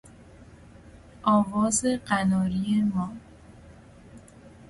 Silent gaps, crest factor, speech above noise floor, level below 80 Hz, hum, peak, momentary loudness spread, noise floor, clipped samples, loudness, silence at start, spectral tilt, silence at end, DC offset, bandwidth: none; 20 dB; 25 dB; -52 dBFS; none; -8 dBFS; 9 LU; -49 dBFS; under 0.1%; -25 LUFS; 0.05 s; -5 dB/octave; 0.05 s; under 0.1%; 11.5 kHz